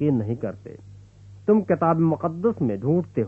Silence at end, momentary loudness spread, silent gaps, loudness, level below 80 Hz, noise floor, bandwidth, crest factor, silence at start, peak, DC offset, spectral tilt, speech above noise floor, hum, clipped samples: 0 s; 12 LU; none; -23 LUFS; -56 dBFS; -46 dBFS; 3.4 kHz; 16 dB; 0 s; -6 dBFS; under 0.1%; -11 dB/octave; 24 dB; 50 Hz at -45 dBFS; under 0.1%